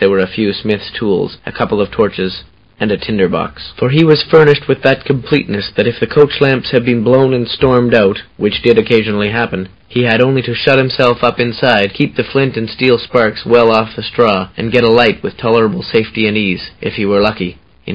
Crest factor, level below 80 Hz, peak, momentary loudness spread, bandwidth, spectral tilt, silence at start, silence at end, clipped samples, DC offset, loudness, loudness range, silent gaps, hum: 12 dB; -40 dBFS; 0 dBFS; 9 LU; 8 kHz; -8 dB/octave; 0 s; 0 s; 0.3%; under 0.1%; -12 LUFS; 2 LU; none; none